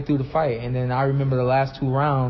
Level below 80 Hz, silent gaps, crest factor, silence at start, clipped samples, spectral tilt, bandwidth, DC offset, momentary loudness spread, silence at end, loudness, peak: -44 dBFS; none; 12 dB; 0 s; under 0.1%; -7 dB/octave; 5.8 kHz; under 0.1%; 4 LU; 0 s; -22 LUFS; -10 dBFS